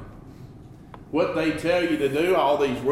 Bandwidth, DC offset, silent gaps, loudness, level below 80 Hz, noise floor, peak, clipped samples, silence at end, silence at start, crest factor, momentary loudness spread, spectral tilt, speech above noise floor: 15.5 kHz; under 0.1%; none; -23 LUFS; -50 dBFS; -44 dBFS; -10 dBFS; under 0.1%; 0 s; 0 s; 14 dB; 23 LU; -6 dB/octave; 22 dB